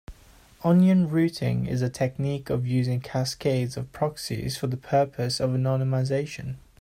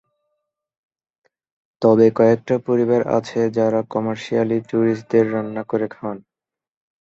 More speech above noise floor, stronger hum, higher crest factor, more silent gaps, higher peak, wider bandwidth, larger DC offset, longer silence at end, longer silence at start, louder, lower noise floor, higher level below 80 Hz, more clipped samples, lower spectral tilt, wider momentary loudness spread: second, 29 dB vs 70 dB; neither; about the same, 16 dB vs 18 dB; neither; second, -10 dBFS vs -2 dBFS; first, 15 kHz vs 7.8 kHz; neither; second, 0.2 s vs 0.8 s; second, 0.1 s vs 1.8 s; second, -25 LUFS vs -19 LUFS; second, -53 dBFS vs -88 dBFS; first, -52 dBFS vs -62 dBFS; neither; second, -6.5 dB/octave vs -8 dB/octave; about the same, 10 LU vs 10 LU